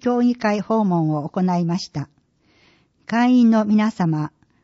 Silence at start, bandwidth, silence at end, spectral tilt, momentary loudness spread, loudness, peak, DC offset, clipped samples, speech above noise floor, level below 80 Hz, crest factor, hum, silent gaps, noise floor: 0.05 s; 7.6 kHz; 0.35 s; -7 dB/octave; 13 LU; -19 LUFS; -8 dBFS; under 0.1%; under 0.1%; 41 dB; -64 dBFS; 12 dB; none; none; -59 dBFS